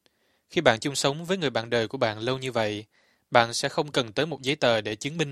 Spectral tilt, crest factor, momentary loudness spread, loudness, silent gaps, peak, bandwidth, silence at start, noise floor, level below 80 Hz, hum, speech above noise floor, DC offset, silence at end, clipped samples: -4 dB/octave; 26 dB; 7 LU; -26 LUFS; none; 0 dBFS; 14.5 kHz; 0.5 s; -68 dBFS; -62 dBFS; none; 42 dB; under 0.1%; 0 s; under 0.1%